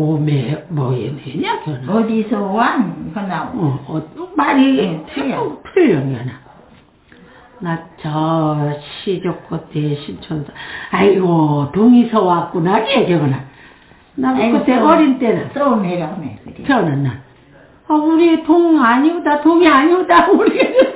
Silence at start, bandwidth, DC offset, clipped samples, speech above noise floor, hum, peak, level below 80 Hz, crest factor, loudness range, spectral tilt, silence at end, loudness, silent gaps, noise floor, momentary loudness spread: 0 s; 4 kHz; under 0.1%; under 0.1%; 32 dB; none; 0 dBFS; -50 dBFS; 14 dB; 8 LU; -11 dB/octave; 0 s; -15 LUFS; none; -47 dBFS; 14 LU